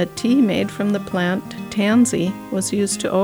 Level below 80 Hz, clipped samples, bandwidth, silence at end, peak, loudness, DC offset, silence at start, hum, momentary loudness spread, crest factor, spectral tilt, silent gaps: -54 dBFS; under 0.1%; over 20 kHz; 0 s; -6 dBFS; -19 LUFS; under 0.1%; 0 s; none; 7 LU; 12 dB; -5 dB/octave; none